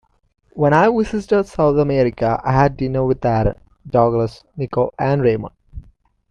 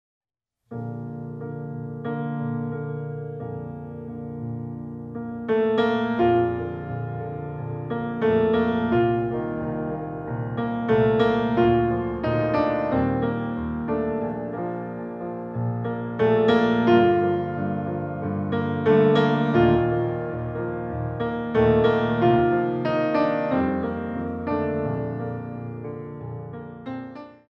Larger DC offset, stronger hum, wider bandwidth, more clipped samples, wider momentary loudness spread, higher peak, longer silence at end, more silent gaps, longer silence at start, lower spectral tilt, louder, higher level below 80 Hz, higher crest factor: neither; neither; first, 9.8 kHz vs 6.6 kHz; neither; second, 10 LU vs 15 LU; first, -2 dBFS vs -6 dBFS; first, 0.5 s vs 0.15 s; neither; second, 0.55 s vs 0.7 s; about the same, -8.5 dB/octave vs -9.5 dB/octave; first, -18 LUFS vs -24 LUFS; first, -38 dBFS vs -48 dBFS; about the same, 16 dB vs 18 dB